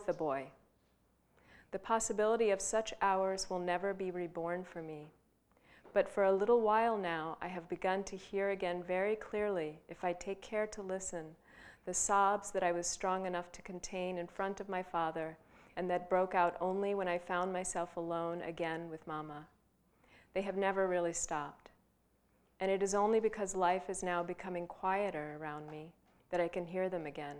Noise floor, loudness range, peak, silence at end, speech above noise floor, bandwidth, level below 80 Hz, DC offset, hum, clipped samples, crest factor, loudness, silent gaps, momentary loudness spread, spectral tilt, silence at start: -74 dBFS; 5 LU; -16 dBFS; 0 s; 38 dB; 15 kHz; -66 dBFS; under 0.1%; none; under 0.1%; 20 dB; -36 LUFS; none; 13 LU; -4 dB/octave; 0 s